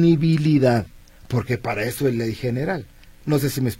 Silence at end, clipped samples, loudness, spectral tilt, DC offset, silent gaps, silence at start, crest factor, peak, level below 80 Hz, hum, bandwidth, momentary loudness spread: 0 s; under 0.1%; -22 LUFS; -7 dB/octave; under 0.1%; none; 0 s; 16 dB; -6 dBFS; -46 dBFS; none; 16.5 kHz; 10 LU